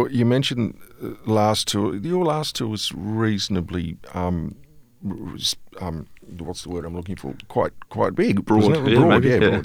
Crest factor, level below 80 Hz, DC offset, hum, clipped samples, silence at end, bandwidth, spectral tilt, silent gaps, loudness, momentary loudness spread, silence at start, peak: 22 dB; -48 dBFS; under 0.1%; none; under 0.1%; 0 s; 17 kHz; -5.5 dB/octave; none; -22 LUFS; 17 LU; 0 s; 0 dBFS